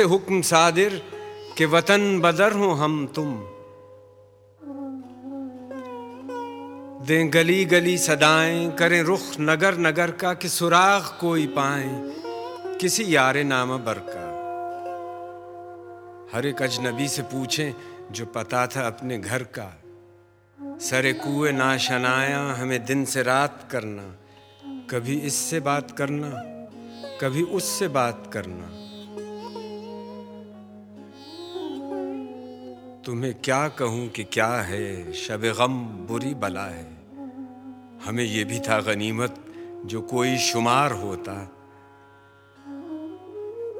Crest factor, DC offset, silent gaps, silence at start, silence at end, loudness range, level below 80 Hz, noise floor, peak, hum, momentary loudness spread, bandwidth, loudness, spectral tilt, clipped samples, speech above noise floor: 24 dB; under 0.1%; none; 0 s; 0 s; 11 LU; -66 dBFS; -54 dBFS; -2 dBFS; none; 21 LU; 18 kHz; -23 LUFS; -4 dB/octave; under 0.1%; 31 dB